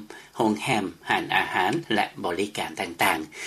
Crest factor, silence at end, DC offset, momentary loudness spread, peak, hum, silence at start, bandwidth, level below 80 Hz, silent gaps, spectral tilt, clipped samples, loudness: 20 dB; 0 s; under 0.1%; 6 LU; -6 dBFS; none; 0 s; 15 kHz; -64 dBFS; none; -4 dB/octave; under 0.1%; -25 LUFS